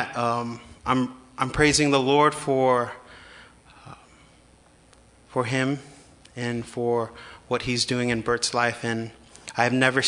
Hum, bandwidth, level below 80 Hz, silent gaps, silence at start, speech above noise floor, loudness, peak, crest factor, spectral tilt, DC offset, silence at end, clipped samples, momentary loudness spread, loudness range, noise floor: none; 11 kHz; -52 dBFS; none; 0 s; 32 dB; -24 LUFS; -2 dBFS; 22 dB; -4 dB/octave; under 0.1%; 0 s; under 0.1%; 15 LU; 9 LU; -55 dBFS